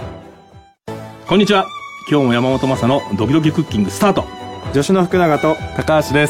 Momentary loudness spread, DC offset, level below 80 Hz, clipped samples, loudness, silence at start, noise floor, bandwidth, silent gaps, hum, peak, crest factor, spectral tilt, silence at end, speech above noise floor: 15 LU; under 0.1%; -42 dBFS; under 0.1%; -15 LUFS; 0 s; -44 dBFS; 16.5 kHz; none; none; -2 dBFS; 14 dB; -6 dB/octave; 0 s; 30 dB